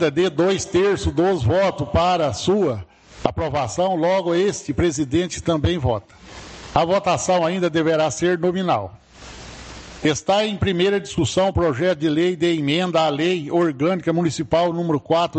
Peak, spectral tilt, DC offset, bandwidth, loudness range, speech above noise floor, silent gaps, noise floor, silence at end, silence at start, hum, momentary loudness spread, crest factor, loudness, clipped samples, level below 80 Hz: 0 dBFS; -5.5 dB/octave; under 0.1%; 9 kHz; 2 LU; 20 dB; none; -39 dBFS; 0 s; 0 s; none; 6 LU; 20 dB; -20 LUFS; under 0.1%; -42 dBFS